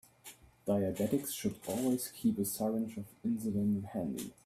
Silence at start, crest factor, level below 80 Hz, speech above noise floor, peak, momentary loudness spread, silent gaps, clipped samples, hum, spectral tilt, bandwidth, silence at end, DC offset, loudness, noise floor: 0.25 s; 16 dB; -68 dBFS; 22 dB; -18 dBFS; 8 LU; none; under 0.1%; none; -6 dB/octave; 16 kHz; 0.15 s; under 0.1%; -35 LUFS; -57 dBFS